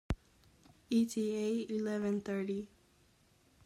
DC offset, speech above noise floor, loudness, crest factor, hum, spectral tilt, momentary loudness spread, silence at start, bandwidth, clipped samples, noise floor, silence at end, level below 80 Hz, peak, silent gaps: under 0.1%; 34 dB; -36 LUFS; 16 dB; none; -6 dB/octave; 10 LU; 0.1 s; 15 kHz; under 0.1%; -69 dBFS; 1 s; -54 dBFS; -20 dBFS; none